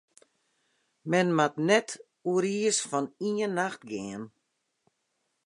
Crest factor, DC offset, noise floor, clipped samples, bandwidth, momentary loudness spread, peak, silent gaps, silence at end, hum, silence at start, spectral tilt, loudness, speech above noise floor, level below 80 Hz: 22 dB; under 0.1%; -78 dBFS; under 0.1%; 11.5 kHz; 15 LU; -10 dBFS; none; 1.2 s; none; 1.05 s; -4 dB/octave; -28 LUFS; 51 dB; -78 dBFS